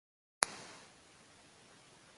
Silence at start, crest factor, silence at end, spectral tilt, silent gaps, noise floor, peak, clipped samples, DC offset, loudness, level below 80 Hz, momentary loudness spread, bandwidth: 0.4 s; 40 dB; 0.05 s; 0 dB/octave; none; -62 dBFS; -4 dBFS; under 0.1%; under 0.1%; -37 LUFS; -78 dBFS; 24 LU; 11.5 kHz